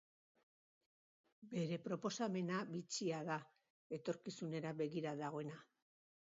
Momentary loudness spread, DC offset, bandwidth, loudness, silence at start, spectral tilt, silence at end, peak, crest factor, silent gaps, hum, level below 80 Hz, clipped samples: 7 LU; under 0.1%; 7.4 kHz; -45 LUFS; 1.4 s; -5.5 dB/octave; 0.55 s; -28 dBFS; 18 dB; 3.70-3.90 s; none; -88 dBFS; under 0.1%